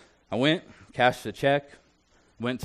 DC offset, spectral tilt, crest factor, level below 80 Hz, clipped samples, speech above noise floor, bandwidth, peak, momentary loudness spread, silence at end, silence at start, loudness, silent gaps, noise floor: under 0.1%; -5.5 dB/octave; 20 dB; -62 dBFS; under 0.1%; 37 dB; 13 kHz; -8 dBFS; 10 LU; 0 s; 0.3 s; -26 LUFS; none; -63 dBFS